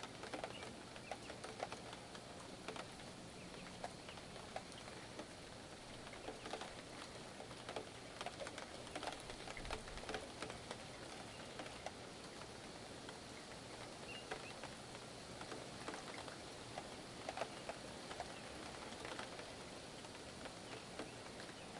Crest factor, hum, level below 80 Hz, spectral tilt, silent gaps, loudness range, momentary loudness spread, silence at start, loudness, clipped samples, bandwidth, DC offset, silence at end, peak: 24 dB; none; -68 dBFS; -3.5 dB/octave; none; 3 LU; 5 LU; 0 s; -51 LUFS; under 0.1%; 11.5 kHz; under 0.1%; 0 s; -28 dBFS